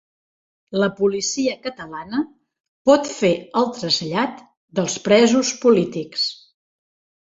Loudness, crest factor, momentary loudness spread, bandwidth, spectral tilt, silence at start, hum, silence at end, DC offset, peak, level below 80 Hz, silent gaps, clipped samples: -20 LUFS; 20 dB; 11 LU; 8 kHz; -4 dB/octave; 0.7 s; none; 0.95 s; under 0.1%; -2 dBFS; -62 dBFS; 2.60-2.85 s, 4.57-4.68 s; under 0.1%